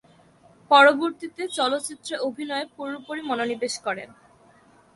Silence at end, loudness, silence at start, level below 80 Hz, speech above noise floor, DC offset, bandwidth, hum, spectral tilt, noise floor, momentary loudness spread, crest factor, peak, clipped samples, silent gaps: 0.9 s; -23 LUFS; 0.7 s; -72 dBFS; 32 dB; under 0.1%; 11.5 kHz; none; -2 dB/octave; -56 dBFS; 18 LU; 22 dB; -4 dBFS; under 0.1%; none